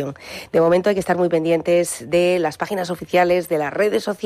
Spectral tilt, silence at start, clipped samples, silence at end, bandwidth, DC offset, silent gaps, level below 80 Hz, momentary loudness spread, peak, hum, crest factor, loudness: -5 dB/octave; 0 s; under 0.1%; 0 s; 15 kHz; under 0.1%; none; -56 dBFS; 7 LU; -6 dBFS; none; 12 dB; -19 LUFS